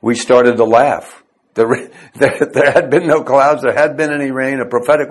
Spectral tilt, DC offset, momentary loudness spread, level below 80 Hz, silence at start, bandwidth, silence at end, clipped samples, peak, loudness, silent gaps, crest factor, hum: -5.5 dB/octave; under 0.1%; 7 LU; -54 dBFS; 0.05 s; 12.5 kHz; 0 s; 0.3%; 0 dBFS; -13 LUFS; none; 12 dB; none